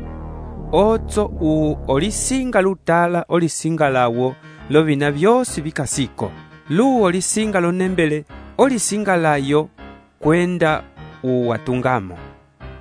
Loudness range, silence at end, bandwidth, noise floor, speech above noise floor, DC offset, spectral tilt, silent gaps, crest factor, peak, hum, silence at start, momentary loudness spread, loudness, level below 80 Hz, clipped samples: 2 LU; 0 s; 11 kHz; -38 dBFS; 21 dB; under 0.1%; -5 dB/octave; none; 18 dB; -2 dBFS; none; 0 s; 11 LU; -18 LUFS; -38 dBFS; under 0.1%